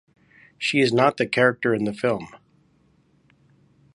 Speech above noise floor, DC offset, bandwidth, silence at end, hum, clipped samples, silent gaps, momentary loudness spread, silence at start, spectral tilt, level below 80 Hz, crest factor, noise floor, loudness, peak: 40 dB; under 0.1%; 11.5 kHz; 1.6 s; none; under 0.1%; none; 9 LU; 0.6 s; -5.5 dB/octave; -64 dBFS; 22 dB; -61 dBFS; -21 LUFS; -4 dBFS